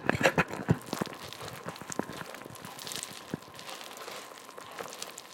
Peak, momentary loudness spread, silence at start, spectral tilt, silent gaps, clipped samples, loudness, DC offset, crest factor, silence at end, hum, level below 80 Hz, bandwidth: -6 dBFS; 15 LU; 0 s; -4.5 dB/octave; none; under 0.1%; -35 LUFS; under 0.1%; 30 dB; 0 s; none; -60 dBFS; 17 kHz